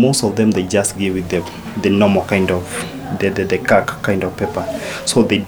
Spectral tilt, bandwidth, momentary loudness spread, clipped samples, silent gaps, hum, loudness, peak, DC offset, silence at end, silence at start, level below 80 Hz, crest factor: -5 dB/octave; over 20 kHz; 9 LU; under 0.1%; none; none; -17 LUFS; 0 dBFS; under 0.1%; 0 s; 0 s; -44 dBFS; 16 dB